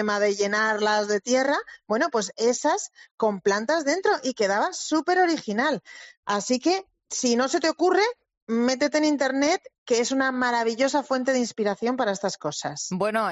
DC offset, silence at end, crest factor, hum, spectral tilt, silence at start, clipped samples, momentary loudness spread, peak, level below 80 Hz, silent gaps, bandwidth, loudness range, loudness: under 0.1%; 0 s; 14 dB; none; -3 dB/octave; 0 s; under 0.1%; 7 LU; -10 dBFS; -70 dBFS; 3.11-3.18 s, 6.17-6.23 s, 8.37-8.47 s, 9.78-9.86 s; 8.4 kHz; 1 LU; -24 LUFS